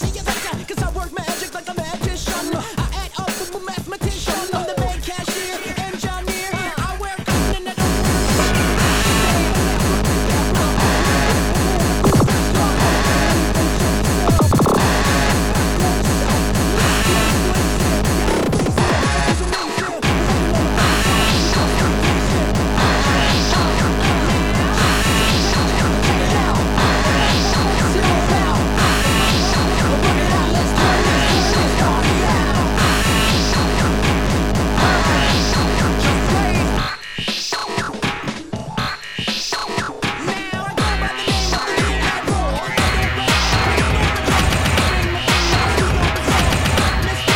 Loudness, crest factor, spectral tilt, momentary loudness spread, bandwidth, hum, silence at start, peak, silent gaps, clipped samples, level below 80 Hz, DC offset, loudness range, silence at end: -17 LUFS; 14 dB; -4.5 dB/octave; 9 LU; over 20 kHz; none; 0 s; -2 dBFS; none; under 0.1%; -24 dBFS; 0.6%; 7 LU; 0 s